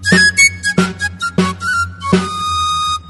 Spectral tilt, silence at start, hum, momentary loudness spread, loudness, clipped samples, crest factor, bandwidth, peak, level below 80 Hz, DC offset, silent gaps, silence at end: -3 dB/octave; 0 s; none; 9 LU; -13 LUFS; under 0.1%; 14 dB; 12 kHz; 0 dBFS; -40 dBFS; under 0.1%; none; 0 s